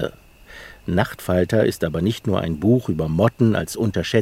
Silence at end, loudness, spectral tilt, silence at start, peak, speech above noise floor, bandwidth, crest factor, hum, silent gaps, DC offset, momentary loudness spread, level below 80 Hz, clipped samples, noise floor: 0 s; -21 LUFS; -6.5 dB/octave; 0 s; -2 dBFS; 25 dB; 16.5 kHz; 18 dB; none; none; under 0.1%; 9 LU; -46 dBFS; under 0.1%; -44 dBFS